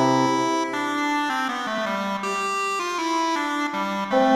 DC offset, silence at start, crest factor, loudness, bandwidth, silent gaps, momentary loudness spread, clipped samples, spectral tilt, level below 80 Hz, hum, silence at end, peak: under 0.1%; 0 s; 16 dB; -24 LUFS; 15 kHz; none; 5 LU; under 0.1%; -4 dB/octave; -64 dBFS; none; 0 s; -6 dBFS